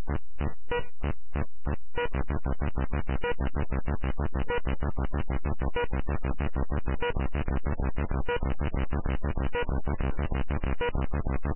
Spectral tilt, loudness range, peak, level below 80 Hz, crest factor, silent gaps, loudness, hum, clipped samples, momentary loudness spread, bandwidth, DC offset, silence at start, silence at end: -10.5 dB/octave; 1 LU; -18 dBFS; -32 dBFS; 10 dB; none; -32 LUFS; none; under 0.1%; 4 LU; 3.2 kHz; 4%; 0 s; 0 s